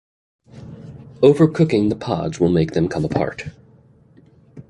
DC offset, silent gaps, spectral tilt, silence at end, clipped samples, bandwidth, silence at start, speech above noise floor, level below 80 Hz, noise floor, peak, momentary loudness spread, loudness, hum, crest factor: under 0.1%; none; -8 dB/octave; 0.1 s; under 0.1%; 11 kHz; 0.55 s; 34 dB; -46 dBFS; -51 dBFS; -2 dBFS; 23 LU; -18 LUFS; none; 18 dB